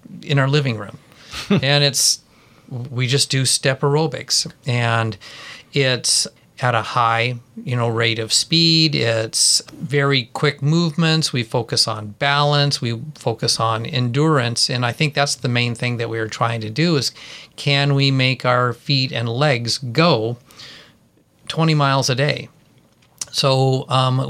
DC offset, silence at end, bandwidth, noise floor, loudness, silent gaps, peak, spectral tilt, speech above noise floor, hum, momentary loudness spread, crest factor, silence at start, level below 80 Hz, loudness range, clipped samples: under 0.1%; 0 s; 15 kHz; -56 dBFS; -18 LUFS; none; -2 dBFS; -4 dB/octave; 37 dB; none; 11 LU; 18 dB; 0.1 s; -58 dBFS; 3 LU; under 0.1%